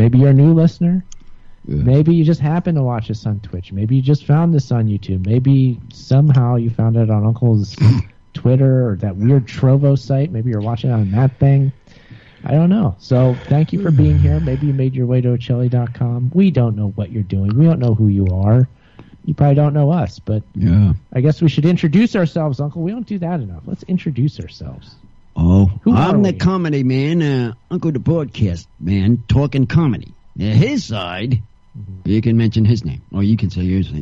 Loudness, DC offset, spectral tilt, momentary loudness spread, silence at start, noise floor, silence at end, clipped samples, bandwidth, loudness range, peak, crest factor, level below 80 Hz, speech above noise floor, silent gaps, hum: -16 LUFS; under 0.1%; -9 dB/octave; 10 LU; 0 s; -41 dBFS; 0 s; under 0.1%; 7.2 kHz; 3 LU; -2 dBFS; 12 dB; -36 dBFS; 27 dB; none; none